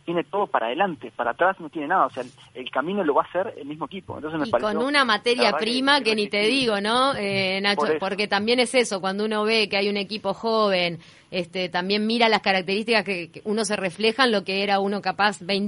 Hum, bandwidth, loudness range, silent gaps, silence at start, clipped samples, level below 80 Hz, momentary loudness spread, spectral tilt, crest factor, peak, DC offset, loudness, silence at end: none; 11 kHz; 4 LU; none; 0.05 s; under 0.1%; -64 dBFS; 10 LU; -4 dB/octave; 18 dB; -4 dBFS; under 0.1%; -22 LUFS; 0 s